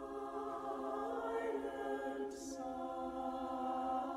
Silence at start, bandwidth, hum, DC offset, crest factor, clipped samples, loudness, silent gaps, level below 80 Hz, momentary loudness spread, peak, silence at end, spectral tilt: 0 s; 15 kHz; none; under 0.1%; 12 dB; under 0.1%; -42 LUFS; none; -68 dBFS; 5 LU; -30 dBFS; 0 s; -4.5 dB/octave